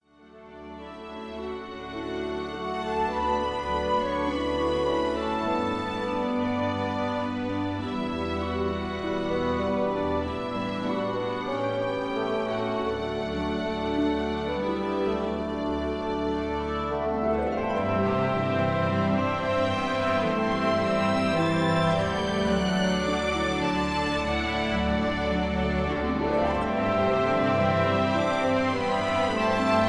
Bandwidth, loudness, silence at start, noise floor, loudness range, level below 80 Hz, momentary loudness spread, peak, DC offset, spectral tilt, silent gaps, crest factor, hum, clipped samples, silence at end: 11 kHz; -27 LUFS; 0.35 s; -50 dBFS; 4 LU; -44 dBFS; 6 LU; -10 dBFS; under 0.1%; -6 dB/octave; none; 16 dB; none; under 0.1%; 0 s